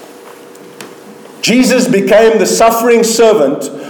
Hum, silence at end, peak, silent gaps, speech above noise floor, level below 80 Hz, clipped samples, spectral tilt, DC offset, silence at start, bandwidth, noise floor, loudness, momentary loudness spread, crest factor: none; 0 s; 0 dBFS; none; 25 dB; -48 dBFS; under 0.1%; -4 dB/octave; under 0.1%; 0 s; 19.5 kHz; -34 dBFS; -9 LUFS; 5 LU; 10 dB